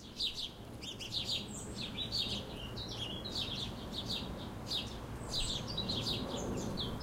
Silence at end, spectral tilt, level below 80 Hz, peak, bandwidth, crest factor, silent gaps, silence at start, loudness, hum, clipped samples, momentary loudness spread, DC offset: 0 s; -3.5 dB/octave; -50 dBFS; -24 dBFS; 16 kHz; 16 dB; none; 0 s; -38 LUFS; none; under 0.1%; 8 LU; under 0.1%